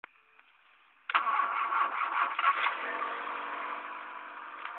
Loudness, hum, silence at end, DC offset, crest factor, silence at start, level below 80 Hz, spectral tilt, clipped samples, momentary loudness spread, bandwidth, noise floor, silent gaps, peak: -31 LUFS; none; 0 s; under 0.1%; 22 dB; 1.1 s; under -90 dBFS; -3 dB/octave; under 0.1%; 14 LU; 4.4 kHz; -63 dBFS; none; -12 dBFS